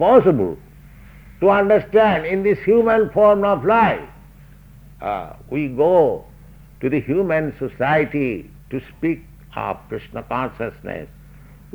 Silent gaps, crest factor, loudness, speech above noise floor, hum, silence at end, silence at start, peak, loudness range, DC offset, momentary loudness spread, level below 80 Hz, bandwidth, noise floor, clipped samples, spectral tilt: none; 18 dB; -18 LUFS; 26 dB; none; 0.7 s; 0 s; -2 dBFS; 8 LU; under 0.1%; 16 LU; -46 dBFS; over 20 kHz; -44 dBFS; under 0.1%; -8.5 dB/octave